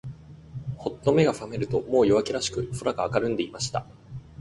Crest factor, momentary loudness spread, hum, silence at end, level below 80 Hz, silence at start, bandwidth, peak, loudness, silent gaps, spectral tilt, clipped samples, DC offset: 20 dB; 21 LU; none; 0.05 s; -52 dBFS; 0.05 s; 11.5 kHz; -8 dBFS; -26 LUFS; none; -5.5 dB/octave; under 0.1%; under 0.1%